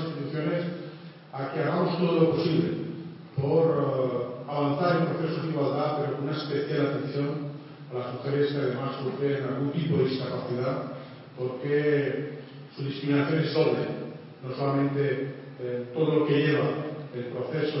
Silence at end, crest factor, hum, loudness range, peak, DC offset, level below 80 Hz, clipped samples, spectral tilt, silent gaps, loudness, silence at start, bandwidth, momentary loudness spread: 0 s; 18 dB; none; 3 LU; -10 dBFS; under 0.1%; -70 dBFS; under 0.1%; -11 dB/octave; none; -28 LUFS; 0 s; 5.8 kHz; 14 LU